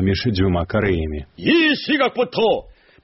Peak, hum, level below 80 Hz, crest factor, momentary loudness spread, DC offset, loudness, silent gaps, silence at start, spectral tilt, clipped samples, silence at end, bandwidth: -4 dBFS; none; -36 dBFS; 14 dB; 8 LU; under 0.1%; -19 LUFS; none; 0 s; -4 dB/octave; under 0.1%; 0.35 s; 6 kHz